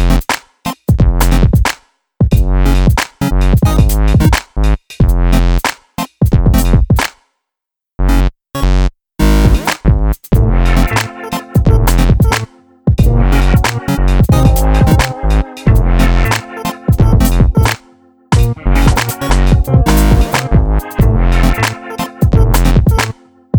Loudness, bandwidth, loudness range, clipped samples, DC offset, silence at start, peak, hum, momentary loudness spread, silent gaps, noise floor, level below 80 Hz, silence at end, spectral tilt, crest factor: -12 LUFS; 19.5 kHz; 3 LU; under 0.1%; under 0.1%; 0 s; 0 dBFS; none; 8 LU; none; -82 dBFS; -12 dBFS; 0 s; -6 dB/octave; 10 dB